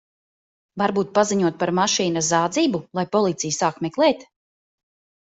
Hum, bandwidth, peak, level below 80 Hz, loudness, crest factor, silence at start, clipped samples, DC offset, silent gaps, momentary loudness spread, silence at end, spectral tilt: none; 8.2 kHz; -6 dBFS; -64 dBFS; -21 LUFS; 18 dB; 0.75 s; under 0.1%; under 0.1%; none; 5 LU; 1 s; -4 dB/octave